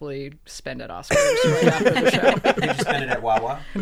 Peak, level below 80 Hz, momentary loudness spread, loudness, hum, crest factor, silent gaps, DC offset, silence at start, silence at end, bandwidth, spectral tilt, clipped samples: -4 dBFS; -44 dBFS; 16 LU; -19 LUFS; none; 18 dB; none; under 0.1%; 0 s; 0 s; 15.5 kHz; -4.5 dB/octave; under 0.1%